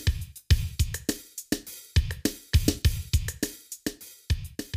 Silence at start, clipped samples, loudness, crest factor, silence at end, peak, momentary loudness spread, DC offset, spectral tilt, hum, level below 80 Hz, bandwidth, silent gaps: 0 s; under 0.1%; -29 LUFS; 22 dB; 0 s; -6 dBFS; 10 LU; under 0.1%; -4.5 dB/octave; none; -32 dBFS; 16 kHz; none